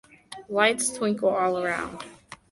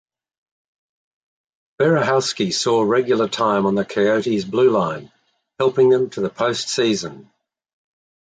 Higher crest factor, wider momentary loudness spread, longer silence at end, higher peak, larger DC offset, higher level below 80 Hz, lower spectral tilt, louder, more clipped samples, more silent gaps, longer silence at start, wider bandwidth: about the same, 20 dB vs 16 dB; first, 20 LU vs 6 LU; second, 0.15 s vs 1.05 s; about the same, -6 dBFS vs -6 dBFS; neither; about the same, -62 dBFS vs -62 dBFS; second, -3 dB/octave vs -4.5 dB/octave; second, -25 LUFS vs -18 LUFS; neither; neither; second, 0.3 s vs 1.8 s; first, 12 kHz vs 9.4 kHz